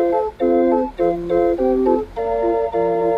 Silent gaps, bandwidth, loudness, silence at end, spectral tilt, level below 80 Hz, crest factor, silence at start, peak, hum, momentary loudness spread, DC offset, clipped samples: none; 5.6 kHz; -18 LUFS; 0 s; -8.5 dB/octave; -42 dBFS; 14 dB; 0 s; -4 dBFS; none; 4 LU; under 0.1%; under 0.1%